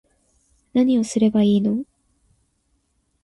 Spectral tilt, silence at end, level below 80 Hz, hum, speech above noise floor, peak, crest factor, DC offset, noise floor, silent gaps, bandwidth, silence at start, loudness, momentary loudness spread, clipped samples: -6.5 dB/octave; 1.4 s; -58 dBFS; none; 50 dB; -8 dBFS; 14 dB; under 0.1%; -68 dBFS; none; 11.5 kHz; 0.75 s; -19 LUFS; 9 LU; under 0.1%